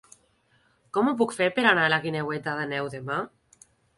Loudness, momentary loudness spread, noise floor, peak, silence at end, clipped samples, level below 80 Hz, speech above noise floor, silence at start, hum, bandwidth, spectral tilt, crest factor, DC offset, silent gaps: -25 LUFS; 11 LU; -65 dBFS; -6 dBFS; 0.7 s; under 0.1%; -68 dBFS; 40 dB; 0.95 s; none; 11.5 kHz; -5 dB/octave; 22 dB; under 0.1%; none